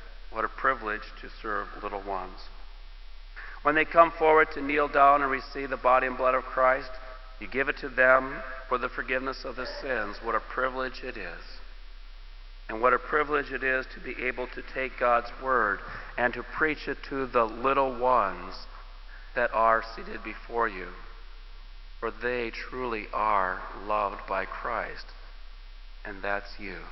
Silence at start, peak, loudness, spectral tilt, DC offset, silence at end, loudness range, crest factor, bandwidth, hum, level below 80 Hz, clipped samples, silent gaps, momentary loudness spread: 0 s; -4 dBFS; -27 LUFS; -6.5 dB/octave; under 0.1%; 0 s; 9 LU; 24 dB; 6 kHz; none; -44 dBFS; under 0.1%; none; 20 LU